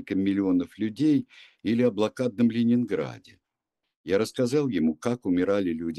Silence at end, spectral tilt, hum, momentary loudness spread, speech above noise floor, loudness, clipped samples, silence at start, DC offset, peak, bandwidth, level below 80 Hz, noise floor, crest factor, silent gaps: 0 s; -7 dB/octave; none; 7 LU; 58 dB; -26 LUFS; under 0.1%; 0 s; under 0.1%; -10 dBFS; 12.5 kHz; -64 dBFS; -84 dBFS; 16 dB; 3.96-4.04 s